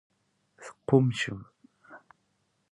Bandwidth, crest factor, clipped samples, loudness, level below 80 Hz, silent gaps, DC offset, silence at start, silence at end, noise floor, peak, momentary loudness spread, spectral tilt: 11 kHz; 24 dB; under 0.1%; -27 LUFS; -66 dBFS; none; under 0.1%; 0.6 s; 0.75 s; -74 dBFS; -8 dBFS; 24 LU; -6.5 dB/octave